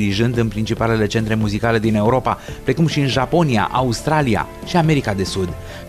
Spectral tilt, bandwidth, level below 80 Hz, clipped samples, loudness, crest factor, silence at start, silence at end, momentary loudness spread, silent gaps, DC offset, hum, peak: -6 dB/octave; 14 kHz; -36 dBFS; under 0.1%; -18 LUFS; 14 dB; 0 s; 0 s; 6 LU; none; under 0.1%; none; -4 dBFS